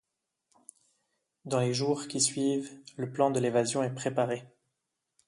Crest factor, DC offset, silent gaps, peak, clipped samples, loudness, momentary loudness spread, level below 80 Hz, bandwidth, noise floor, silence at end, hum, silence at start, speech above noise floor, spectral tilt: 20 dB; under 0.1%; none; -10 dBFS; under 0.1%; -30 LUFS; 11 LU; -74 dBFS; 11.5 kHz; -84 dBFS; 0.8 s; none; 1.45 s; 55 dB; -4.5 dB/octave